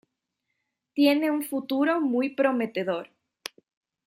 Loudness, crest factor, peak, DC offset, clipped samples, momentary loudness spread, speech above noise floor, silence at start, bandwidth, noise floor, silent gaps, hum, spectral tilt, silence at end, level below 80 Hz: -25 LUFS; 18 dB; -10 dBFS; under 0.1%; under 0.1%; 19 LU; 57 dB; 0.95 s; 16 kHz; -81 dBFS; none; none; -4.5 dB/octave; 1 s; -80 dBFS